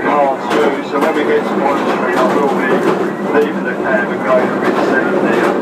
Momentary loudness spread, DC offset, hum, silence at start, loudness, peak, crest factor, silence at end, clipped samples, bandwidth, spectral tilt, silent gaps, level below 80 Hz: 2 LU; under 0.1%; none; 0 s; -14 LUFS; 0 dBFS; 12 dB; 0 s; under 0.1%; 15.5 kHz; -6 dB/octave; none; -58 dBFS